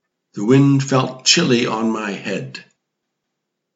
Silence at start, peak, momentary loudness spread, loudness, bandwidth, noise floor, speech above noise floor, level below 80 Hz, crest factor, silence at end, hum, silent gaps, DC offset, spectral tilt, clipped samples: 0.35 s; 0 dBFS; 17 LU; -17 LUFS; 8 kHz; -77 dBFS; 61 dB; -68 dBFS; 18 dB; 1.15 s; none; none; under 0.1%; -4.5 dB/octave; under 0.1%